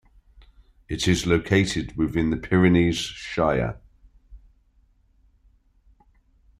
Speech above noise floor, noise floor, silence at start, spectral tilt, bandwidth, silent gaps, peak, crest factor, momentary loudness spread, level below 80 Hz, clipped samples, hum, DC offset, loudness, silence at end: 39 dB; -61 dBFS; 0.9 s; -5.5 dB/octave; 13 kHz; none; -4 dBFS; 20 dB; 10 LU; -44 dBFS; under 0.1%; none; under 0.1%; -23 LUFS; 2.2 s